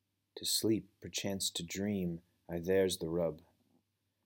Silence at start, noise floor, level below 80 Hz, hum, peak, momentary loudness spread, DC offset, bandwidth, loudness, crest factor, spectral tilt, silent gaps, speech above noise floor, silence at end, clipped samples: 0.35 s; -79 dBFS; -66 dBFS; none; -20 dBFS; 12 LU; under 0.1%; 18 kHz; -36 LUFS; 16 dB; -4 dB/octave; none; 43 dB; 0.85 s; under 0.1%